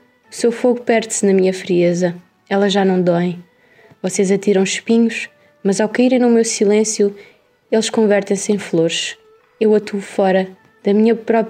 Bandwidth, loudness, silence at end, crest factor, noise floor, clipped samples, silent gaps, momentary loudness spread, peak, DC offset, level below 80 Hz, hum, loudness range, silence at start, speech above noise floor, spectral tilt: 13.5 kHz; -16 LUFS; 0 s; 14 dB; -49 dBFS; under 0.1%; none; 9 LU; -4 dBFS; under 0.1%; -72 dBFS; none; 2 LU; 0.3 s; 34 dB; -5 dB/octave